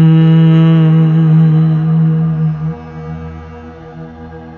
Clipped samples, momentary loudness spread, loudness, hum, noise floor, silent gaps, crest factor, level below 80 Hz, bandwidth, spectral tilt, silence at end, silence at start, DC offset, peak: under 0.1%; 23 LU; -10 LUFS; none; -30 dBFS; none; 10 dB; -38 dBFS; 4.1 kHz; -11 dB/octave; 0 s; 0 s; under 0.1%; 0 dBFS